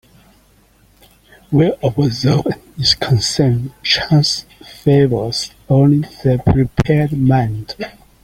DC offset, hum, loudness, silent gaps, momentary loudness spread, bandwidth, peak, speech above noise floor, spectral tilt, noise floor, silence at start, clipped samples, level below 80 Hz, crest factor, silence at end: under 0.1%; none; -15 LUFS; none; 9 LU; 14.5 kHz; 0 dBFS; 37 dB; -6 dB/octave; -51 dBFS; 1.5 s; under 0.1%; -38 dBFS; 16 dB; 0.35 s